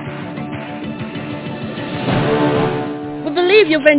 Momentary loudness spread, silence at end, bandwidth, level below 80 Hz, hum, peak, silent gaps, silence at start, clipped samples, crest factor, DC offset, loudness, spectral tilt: 15 LU; 0 s; 4 kHz; -46 dBFS; none; 0 dBFS; none; 0 s; under 0.1%; 16 dB; under 0.1%; -18 LUFS; -10 dB/octave